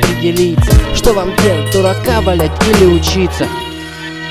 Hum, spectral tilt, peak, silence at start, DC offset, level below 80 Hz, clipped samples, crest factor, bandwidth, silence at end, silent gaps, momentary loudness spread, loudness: none; -5.5 dB/octave; 0 dBFS; 0 s; under 0.1%; -18 dBFS; under 0.1%; 12 dB; 16 kHz; 0 s; none; 13 LU; -12 LUFS